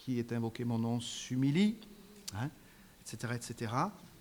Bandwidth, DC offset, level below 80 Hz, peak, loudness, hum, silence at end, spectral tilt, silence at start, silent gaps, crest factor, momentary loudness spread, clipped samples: over 20 kHz; under 0.1%; -68 dBFS; -18 dBFS; -36 LUFS; none; 0 s; -5.5 dB/octave; 0 s; none; 18 dB; 16 LU; under 0.1%